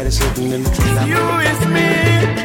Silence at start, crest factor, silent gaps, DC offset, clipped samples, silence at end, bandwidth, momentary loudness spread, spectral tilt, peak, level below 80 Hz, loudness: 0 s; 12 dB; none; under 0.1%; under 0.1%; 0 s; 17 kHz; 5 LU; -5 dB/octave; -2 dBFS; -24 dBFS; -15 LUFS